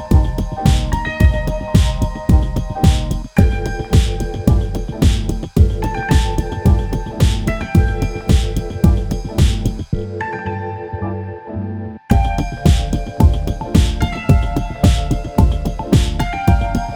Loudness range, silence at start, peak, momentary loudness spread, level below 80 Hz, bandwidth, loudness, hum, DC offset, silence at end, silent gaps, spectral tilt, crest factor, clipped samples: 4 LU; 0 s; 0 dBFS; 8 LU; -18 dBFS; 18 kHz; -17 LUFS; none; under 0.1%; 0 s; none; -6.5 dB/octave; 16 dB; under 0.1%